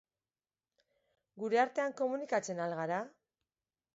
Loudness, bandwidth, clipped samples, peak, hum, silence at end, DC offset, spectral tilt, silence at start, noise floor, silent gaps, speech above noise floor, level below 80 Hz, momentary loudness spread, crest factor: -35 LUFS; 7.6 kHz; under 0.1%; -18 dBFS; none; 0.85 s; under 0.1%; -4 dB/octave; 1.35 s; under -90 dBFS; none; over 56 dB; -88 dBFS; 9 LU; 20 dB